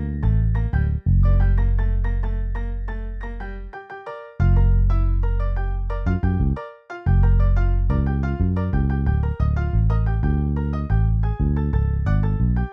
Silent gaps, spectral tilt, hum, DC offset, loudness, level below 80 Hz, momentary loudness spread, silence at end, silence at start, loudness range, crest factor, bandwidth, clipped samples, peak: none; -10.5 dB/octave; none; under 0.1%; -22 LUFS; -22 dBFS; 13 LU; 0 s; 0 s; 3 LU; 12 dB; 3.8 kHz; under 0.1%; -8 dBFS